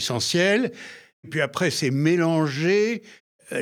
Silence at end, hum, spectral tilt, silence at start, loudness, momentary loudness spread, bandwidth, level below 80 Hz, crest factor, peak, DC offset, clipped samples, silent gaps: 0 s; none; -4.5 dB/octave; 0 s; -22 LUFS; 12 LU; 17 kHz; -70 dBFS; 16 dB; -8 dBFS; under 0.1%; under 0.1%; 1.13-1.23 s, 3.20-3.39 s